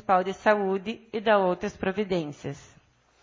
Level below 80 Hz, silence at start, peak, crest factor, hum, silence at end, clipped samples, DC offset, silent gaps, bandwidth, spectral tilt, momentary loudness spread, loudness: -58 dBFS; 0.1 s; -8 dBFS; 20 dB; none; 0.6 s; under 0.1%; under 0.1%; none; 7.6 kHz; -6 dB/octave; 14 LU; -26 LUFS